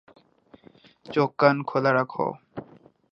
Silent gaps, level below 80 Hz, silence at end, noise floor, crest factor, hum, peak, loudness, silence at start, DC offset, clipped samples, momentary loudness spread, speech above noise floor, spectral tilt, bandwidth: none; -70 dBFS; 0.5 s; -56 dBFS; 24 dB; none; -2 dBFS; -24 LUFS; 1.05 s; under 0.1%; under 0.1%; 20 LU; 32 dB; -8 dB/octave; 6.6 kHz